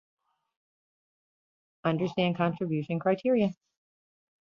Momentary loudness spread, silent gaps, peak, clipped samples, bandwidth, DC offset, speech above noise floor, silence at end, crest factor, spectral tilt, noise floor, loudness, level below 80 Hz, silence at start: 6 LU; none; -14 dBFS; under 0.1%; 6.8 kHz; under 0.1%; over 62 dB; 0.9 s; 18 dB; -8.5 dB/octave; under -90 dBFS; -29 LUFS; -70 dBFS; 1.85 s